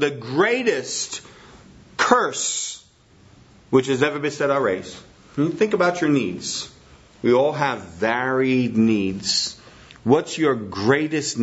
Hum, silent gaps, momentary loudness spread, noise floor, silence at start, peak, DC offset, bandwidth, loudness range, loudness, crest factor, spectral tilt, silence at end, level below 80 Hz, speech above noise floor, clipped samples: none; none; 11 LU; -53 dBFS; 0 s; -2 dBFS; under 0.1%; 8 kHz; 3 LU; -21 LUFS; 20 dB; -4 dB/octave; 0 s; -60 dBFS; 32 dB; under 0.1%